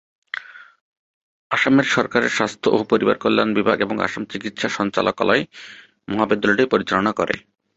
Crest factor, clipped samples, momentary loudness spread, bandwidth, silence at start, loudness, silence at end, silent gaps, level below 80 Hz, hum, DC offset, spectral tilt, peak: 20 dB; under 0.1%; 15 LU; 8 kHz; 0.35 s; -19 LUFS; 0.4 s; 0.81-1.50 s; -56 dBFS; none; under 0.1%; -5 dB/octave; -2 dBFS